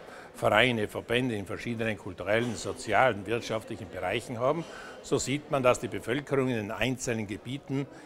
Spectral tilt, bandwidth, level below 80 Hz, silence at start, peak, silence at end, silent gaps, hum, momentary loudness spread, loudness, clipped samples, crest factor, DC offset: -4.5 dB/octave; 16 kHz; -56 dBFS; 0 s; -6 dBFS; 0 s; none; none; 10 LU; -29 LUFS; under 0.1%; 24 dB; under 0.1%